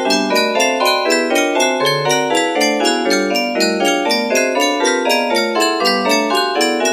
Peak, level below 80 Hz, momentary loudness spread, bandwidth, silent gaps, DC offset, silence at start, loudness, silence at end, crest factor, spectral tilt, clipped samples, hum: -2 dBFS; -66 dBFS; 2 LU; 15.5 kHz; none; under 0.1%; 0 s; -15 LUFS; 0 s; 14 dB; -2.5 dB/octave; under 0.1%; none